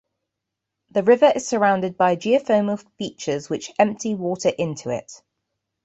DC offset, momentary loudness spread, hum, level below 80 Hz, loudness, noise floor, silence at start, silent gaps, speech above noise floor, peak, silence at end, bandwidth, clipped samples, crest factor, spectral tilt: under 0.1%; 12 LU; none; -64 dBFS; -21 LUFS; -82 dBFS; 0.95 s; none; 62 dB; -4 dBFS; 0.7 s; 8.2 kHz; under 0.1%; 18 dB; -5 dB/octave